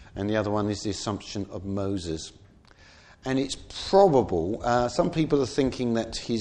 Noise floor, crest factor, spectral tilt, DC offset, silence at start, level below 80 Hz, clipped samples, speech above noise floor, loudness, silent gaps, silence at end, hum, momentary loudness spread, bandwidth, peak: -54 dBFS; 20 dB; -5.5 dB/octave; under 0.1%; 0 s; -48 dBFS; under 0.1%; 28 dB; -26 LUFS; none; 0 s; none; 13 LU; 10.5 kHz; -6 dBFS